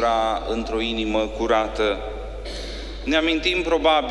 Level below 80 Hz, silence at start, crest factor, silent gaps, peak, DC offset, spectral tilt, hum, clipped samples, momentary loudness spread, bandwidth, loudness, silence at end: -36 dBFS; 0 s; 16 dB; none; -6 dBFS; under 0.1%; -4.5 dB/octave; none; under 0.1%; 13 LU; 11.5 kHz; -22 LUFS; 0 s